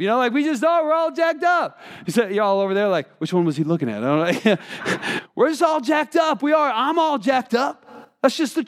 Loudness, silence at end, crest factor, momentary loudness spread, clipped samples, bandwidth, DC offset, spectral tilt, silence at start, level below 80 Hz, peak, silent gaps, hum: -20 LUFS; 0 s; 18 dB; 6 LU; under 0.1%; 15 kHz; under 0.1%; -5.5 dB/octave; 0 s; -76 dBFS; -2 dBFS; none; none